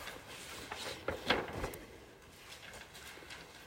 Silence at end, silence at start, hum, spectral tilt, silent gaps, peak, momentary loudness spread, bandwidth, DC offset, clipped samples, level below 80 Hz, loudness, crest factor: 0 s; 0 s; none; -3 dB/octave; none; -16 dBFS; 19 LU; 16 kHz; under 0.1%; under 0.1%; -58 dBFS; -42 LUFS; 28 dB